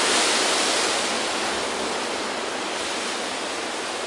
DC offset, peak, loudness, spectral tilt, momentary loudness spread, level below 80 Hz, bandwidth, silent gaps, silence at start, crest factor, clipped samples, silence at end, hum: under 0.1%; -8 dBFS; -23 LUFS; -0.5 dB/octave; 8 LU; -62 dBFS; 11.5 kHz; none; 0 s; 16 dB; under 0.1%; 0 s; none